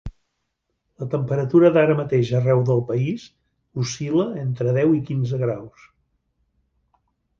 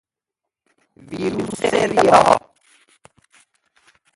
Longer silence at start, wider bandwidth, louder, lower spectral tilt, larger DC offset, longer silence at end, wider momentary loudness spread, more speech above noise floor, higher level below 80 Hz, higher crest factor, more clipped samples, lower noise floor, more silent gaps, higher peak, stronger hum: second, 0.05 s vs 1.1 s; second, 7.4 kHz vs 11.5 kHz; second, -21 LUFS vs -17 LUFS; first, -7.5 dB/octave vs -4.5 dB/octave; neither; about the same, 1.7 s vs 1.75 s; about the same, 14 LU vs 13 LU; second, 56 dB vs 69 dB; about the same, -52 dBFS vs -54 dBFS; about the same, 18 dB vs 20 dB; neither; second, -76 dBFS vs -84 dBFS; neither; second, -4 dBFS vs 0 dBFS; neither